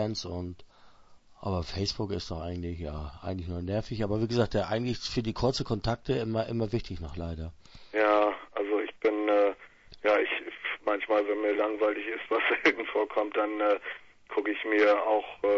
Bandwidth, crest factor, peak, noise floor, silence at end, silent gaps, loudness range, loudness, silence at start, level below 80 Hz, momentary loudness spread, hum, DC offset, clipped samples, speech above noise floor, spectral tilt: 8 kHz; 20 dB; -8 dBFS; -55 dBFS; 0 s; none; 6 LU; -29 LUFS; 0 s; -48 dBFS; 13 LU; none; under 0.1%; under 0.1%; 25 dB; -6 dB/octave